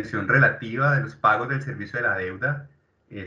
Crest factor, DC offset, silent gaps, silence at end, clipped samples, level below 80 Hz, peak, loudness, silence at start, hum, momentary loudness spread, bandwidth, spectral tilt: 20 dB; under 0.1%; none; 0 s; under 0.1%; -62 dBFS; -4 dBFS; -23 LUFS; 0 s; none; 11 LU; 7.4 kHz; -8 dB/octave